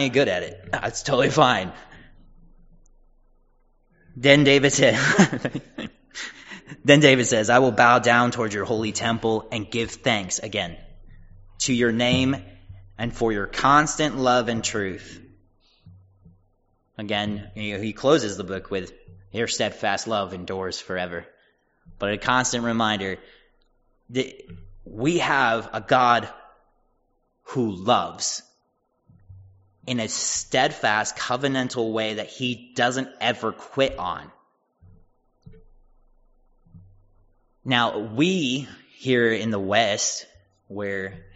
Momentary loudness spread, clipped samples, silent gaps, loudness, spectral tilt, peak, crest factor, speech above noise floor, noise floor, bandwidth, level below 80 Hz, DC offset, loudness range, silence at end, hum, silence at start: 16 LU; under 0.1%; none; -22 LUFS; -3 dB/octave; 0 dBFS; 24 dB; 48 dB; -71 dBFS; 8 kHz; -52 dBFS; under 0.1%; 9 LU; 0.15 s; none; 0 s